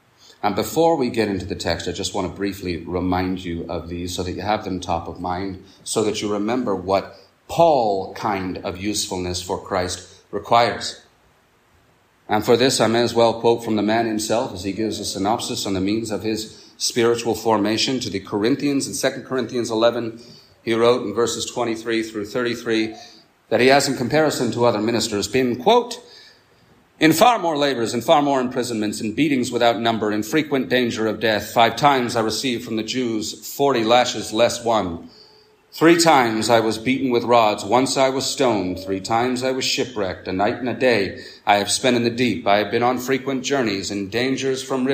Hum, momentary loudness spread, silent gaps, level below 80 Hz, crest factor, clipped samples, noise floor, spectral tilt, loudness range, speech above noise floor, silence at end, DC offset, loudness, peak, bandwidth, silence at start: none; 10 LU; none; -58 dBFS; 18 dB; under 0.1%; -58 dBFS; -4 dB/octave; 5 LU; 38 dB; 0 s; under 0.1%; -20 LUFS; -2 dBFS; 15.5 kHz; 0.45 s